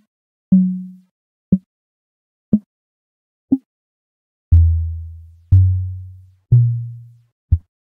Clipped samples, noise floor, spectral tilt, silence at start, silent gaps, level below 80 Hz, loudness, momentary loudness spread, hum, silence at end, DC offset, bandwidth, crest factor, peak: under 0.1%; -39 dBFS; -14 dB/octave; 0.5 s; 1.11-1.52 s, 1.66-2.52 s, 2.66-3.48 s, 3.66-4.51 s, 7.32-7.48 s; -32 dBFS; -18 LUFS; 18 LU; none; 0.25 s; under 0.1%; 0.9 kHz; 16 dB; -2 dBFS